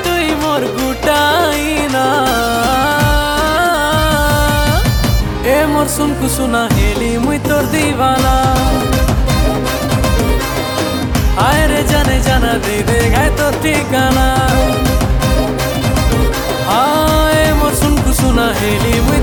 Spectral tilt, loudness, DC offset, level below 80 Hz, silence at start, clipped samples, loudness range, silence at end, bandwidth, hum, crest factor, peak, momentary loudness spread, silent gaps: -5 dB/octave; -13 LUFS; under 0.1%; -18 dBFS; 0 s; under 0.1%; 1 LU; 0 s; 19.5 kHz; none; 12 dB; -2 dBFS; 4 LU; none